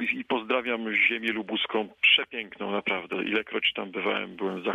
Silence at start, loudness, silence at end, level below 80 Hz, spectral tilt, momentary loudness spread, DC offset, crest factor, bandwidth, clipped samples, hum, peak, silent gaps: 0 s; -26 LUFS; 0 s; -68 dBFS; -5 dB/octave; 10 LU; under 0.1%; 18 dB; 12.5 kHz; under 0.1%; none; -10 dBFS; none